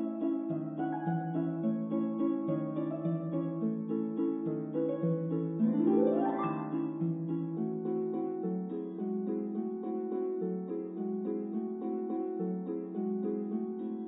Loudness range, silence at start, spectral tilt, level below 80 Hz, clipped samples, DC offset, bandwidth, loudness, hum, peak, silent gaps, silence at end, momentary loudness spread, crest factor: 4 LU; 0 s; -8 dB/octave; -84 dBFS; under 0.1%; under 0.1%; 3.7 kHz; -34 LUFS; none; -16 dBFS; none; 0 s; 6 LU; 18 dB